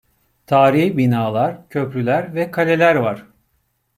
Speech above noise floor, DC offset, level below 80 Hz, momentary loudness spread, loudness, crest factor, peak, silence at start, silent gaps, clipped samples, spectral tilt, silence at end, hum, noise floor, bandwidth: 50 dB; under 0.1%; -60 dBFS; 10 LU; -17 LUFS; 16 dB; -2 dBFS; 0.5 s; none; under 0.1%; -7.5 dB/octave; 0.75 s; none; -66 dBFS; 16 kHz